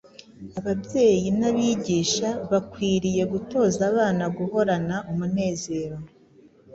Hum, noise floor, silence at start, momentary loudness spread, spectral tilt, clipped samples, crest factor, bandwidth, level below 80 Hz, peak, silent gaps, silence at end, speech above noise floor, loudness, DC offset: none; -54 dBFS; 0.4 s; 9 LU; -5.5 dB/octave; under 0.1%; 16 dB; 8 kHz; -54 dBFS; -8 dBFS; none; 0.7 s; 31 dB; -24 LUFS; under 0.1%